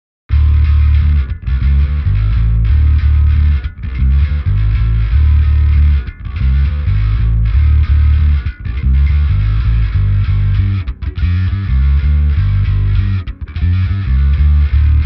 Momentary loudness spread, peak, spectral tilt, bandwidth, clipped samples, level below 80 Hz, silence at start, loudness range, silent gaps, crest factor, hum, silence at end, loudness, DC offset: 7 LU; -2 dBFS; -10 dB/octave; 5 kHz; under 0.1%; -14 dBFS; 0.3 s; 2 LU; none; 8 dB; none; 0 s; -14 LUFS; under 0.1%